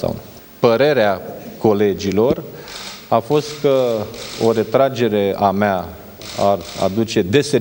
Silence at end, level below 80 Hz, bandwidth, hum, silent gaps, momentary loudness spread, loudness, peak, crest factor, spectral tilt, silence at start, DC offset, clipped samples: 0 s; -50 dBFS; 17 kHz; none; none; 15 LU; -17 LUFS; 0 dBFS; 16 dB; -5.5 dB/octave; 0 s; under 0.1%; under 0.1%